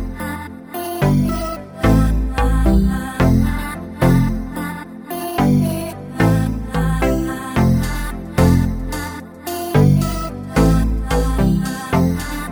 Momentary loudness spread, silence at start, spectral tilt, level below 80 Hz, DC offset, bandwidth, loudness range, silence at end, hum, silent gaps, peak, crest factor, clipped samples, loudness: 12 LU; 0 s; -7 dB/octave; -24 dBFS; under 0.1%; over 20 kHz; 2 LU; 0 s; none; none; -2 dBFS; 16 dB; under 0.1%; -18 LUFS